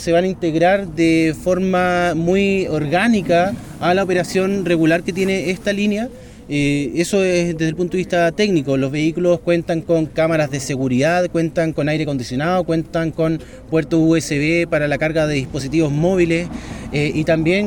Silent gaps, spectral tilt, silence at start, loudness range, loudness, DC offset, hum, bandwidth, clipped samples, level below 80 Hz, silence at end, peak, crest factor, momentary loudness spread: none; -6 dB/octave; 0 s; 2 LU; -18 LUFS; under 0.1%; none; 18 kHz; under 0.1%; -42 dBFS; 0 s; -4 dBFS; 14 dB; 5 LU